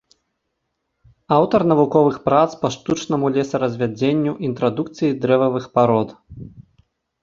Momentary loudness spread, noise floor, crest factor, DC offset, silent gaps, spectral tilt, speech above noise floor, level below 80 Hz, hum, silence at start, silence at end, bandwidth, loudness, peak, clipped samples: 8 LU; -75 dBFS; 20 dB; under 0.1%; none; -7 dB/octave; 57 dB; -54 dBFS; none; 1.3 s; 0.6 s; 7.6 kHz; -19 LUFS; 0 dBFS; under 0.1%